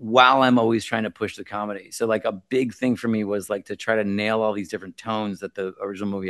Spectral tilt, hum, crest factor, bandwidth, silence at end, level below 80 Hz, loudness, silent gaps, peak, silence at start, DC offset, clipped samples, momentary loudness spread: -5 dB/octave; none; 22 dB; 12.5 kHz; 0 s; -68 dBFS; -23 LUFS; none; 0 dBFS; 0 s; under 0.1%; under 0.1%; 13 LU